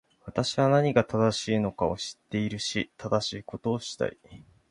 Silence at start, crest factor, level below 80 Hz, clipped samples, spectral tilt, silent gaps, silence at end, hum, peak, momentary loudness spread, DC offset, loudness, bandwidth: 0.25 s; 22 dB; -56 dBFS; under 0.1%; -5.5 dB/octave; none; 0.35 s; none; -6 dBFS; 10 LU; under 0.1%; -28 LUFS; 11.5 kHz